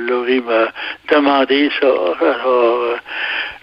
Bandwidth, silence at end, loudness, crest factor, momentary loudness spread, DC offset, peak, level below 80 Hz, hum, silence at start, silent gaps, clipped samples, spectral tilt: 5.6 kHz; 0.05 s; -15 LUFS; 14 dB; 7 LU; under 0.1%; 0 dBFS; -58 dBFS; none; 0 s; none; under 0.1%; -5.5 dB/octave